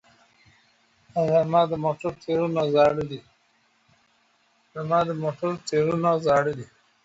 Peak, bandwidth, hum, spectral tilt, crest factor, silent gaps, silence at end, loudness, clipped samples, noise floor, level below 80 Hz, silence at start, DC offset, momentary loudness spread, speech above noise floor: -8 dBFS; 8 kHz; none; -6.5 dB/octave; 18 dB; none; 0.4 s; -24 LUFS; under 0.1%; -65 dBFS; -60 dBFS; 1.15 s; under 0.1%; 15 LU; 42 dB